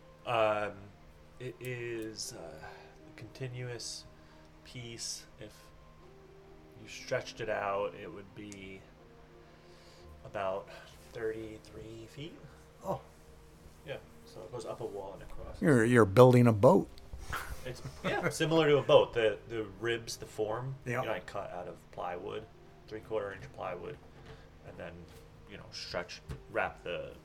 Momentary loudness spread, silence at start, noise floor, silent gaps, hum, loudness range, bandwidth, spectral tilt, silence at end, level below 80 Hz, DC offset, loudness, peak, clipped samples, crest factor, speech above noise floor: 25 LU; 0.1 s; -56 dBFS; none; none; 17 LU; 16.5 kHz; -6 dB/octave; 0.05 s; -58 dBFS; under 0.1%; -32 LUFS; -6 dBFS; under 0.1%; 28 dB; 24 dB